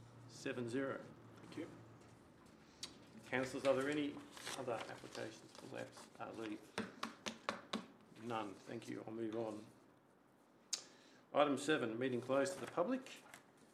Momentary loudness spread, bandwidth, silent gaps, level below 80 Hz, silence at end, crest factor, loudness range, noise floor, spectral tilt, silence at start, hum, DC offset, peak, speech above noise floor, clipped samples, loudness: 21 LU; 14 kHz; none; -82 dBFS; 0.05 s; 26 dB; 8 LU; -70 dBFS; -4 dB/octave; 0 s; none; under 0.1%; -18 dBFS; 28 dB; under 0.1%; -44 LUFS